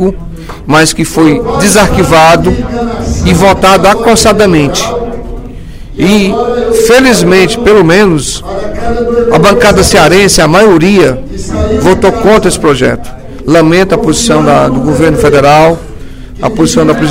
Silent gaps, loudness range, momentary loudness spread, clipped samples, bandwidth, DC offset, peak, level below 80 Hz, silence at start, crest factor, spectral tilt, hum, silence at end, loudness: none; 2 LU; 13 LU; 5%; 17.5 kHz; under 0.1%; 0 dBFS; -22 dBFS; 0 s; 6 dB; -4.5 dB/octave; none; 0 s; -6 LUFS